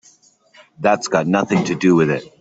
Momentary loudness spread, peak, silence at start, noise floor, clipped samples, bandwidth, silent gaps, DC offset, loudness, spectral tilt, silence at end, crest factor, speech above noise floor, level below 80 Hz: 5 LU; -2 dBFS; 0.8 s; -53 dBFS; under 0.1%; 8 kHz; none; under 0.1%; -17 LUFS; -6 dB/octave; 0.15 s; 16 dB; 36 dB; -58 dBFS